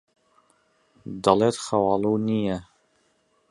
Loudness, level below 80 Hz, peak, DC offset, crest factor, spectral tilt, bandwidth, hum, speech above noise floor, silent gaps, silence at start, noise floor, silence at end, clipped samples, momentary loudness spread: -23 LUFS; -58 dBFS; -2 dBFS; under 0.1%; 24 dB; -6 dB/octave; 11.5 kHz; none; 44 dB; none; 1.05 s; -67 dBFS; 0.9 s; under 0.1%; 15 LU